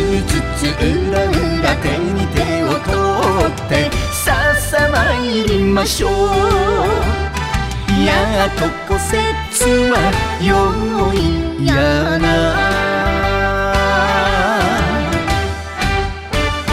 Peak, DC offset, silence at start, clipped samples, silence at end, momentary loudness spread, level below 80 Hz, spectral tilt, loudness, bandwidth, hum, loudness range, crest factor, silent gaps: -2 dBFS; under 0.1%; 0 s; under 0.1%; 0 s; 5 LU; -24 dBFS; -5 dB/octave; -15 LUFS; 16 kHz; none; 2 LU; 14 dB; none